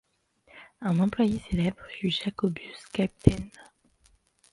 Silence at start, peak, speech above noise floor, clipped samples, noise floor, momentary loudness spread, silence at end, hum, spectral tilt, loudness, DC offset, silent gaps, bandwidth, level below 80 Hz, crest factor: 0.55 s; 0 dBFS; 38 dB; under 0.1%; -65 dBFS; 11 LU; 0.9 s; none; -7 dB/octave; -28 LUFS; under 0.1%; none; 11.5 kHz; -46 dBFS; 28 dB